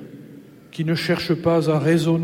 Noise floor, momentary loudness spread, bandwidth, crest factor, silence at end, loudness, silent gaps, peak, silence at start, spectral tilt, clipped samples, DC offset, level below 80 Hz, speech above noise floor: -43 dBFS; 14 LU; 16 kHz; 14 dB; 0 s; -20 LUFS; none; -6 dBFS; 0 s; -7 dB/octave; under 0.1%; under 0.1%; -56 dBFS; 24 dB